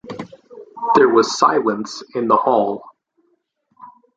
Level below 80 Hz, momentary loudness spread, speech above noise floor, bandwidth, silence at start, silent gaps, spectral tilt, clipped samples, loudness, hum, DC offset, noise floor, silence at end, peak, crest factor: -64 dBFS; 19 LU; 50 dB; 9.2 kHz; 0.05 s; none; -4.5 dB/octave; under 0.1%; -17 LUFS; none; under 0.1%; -66 dBFS; 0.3 s; 0 dBFS; 18 dB